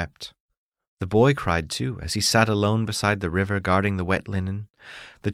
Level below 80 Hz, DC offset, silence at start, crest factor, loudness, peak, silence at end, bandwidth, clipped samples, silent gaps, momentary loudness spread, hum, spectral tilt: -46 dBFS; under 0.1%; 0 s; 20 dB; -23 LUFS; -4 dBFS; 0 s; 15.5 kHz; under 0.1%; 0.40-0.49 s, 0.57-0.72 s, 0.87-0.97 s, 4.70-4.74 s; 18 LU; none; -5 dB/octave